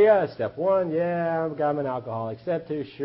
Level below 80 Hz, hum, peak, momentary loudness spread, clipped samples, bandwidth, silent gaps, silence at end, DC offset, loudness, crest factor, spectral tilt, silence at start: -64 dBFS; none; -8 dBFS; 8 LU; under 0.1%; 5.8 kHz; none; 0 s; under 0.1%; -26 LUFS; 16 dB; -11.5 dB/octave; 0 s